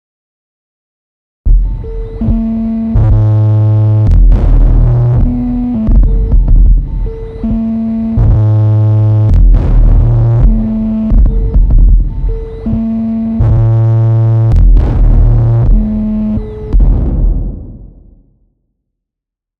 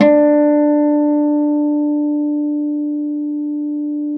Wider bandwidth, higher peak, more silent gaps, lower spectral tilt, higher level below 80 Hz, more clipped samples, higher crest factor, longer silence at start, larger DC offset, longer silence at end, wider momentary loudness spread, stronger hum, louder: second, 2.5 kHz vs 4.1 kHz; about the same, 0 dBFS vs 0 dBFS; neither; first, -11.5 dB/octave vs -9 dB/octave; first, -10 dBFS vs -72 dBFS; neither; second, 8 dB vs 14 dB; first, 1.45 s vs 0 s; neither; first, 1.7 s vs 0 s; about the same, 9 LU vs 9 LU; neither; first, -11 LUFS vs -16 LUFS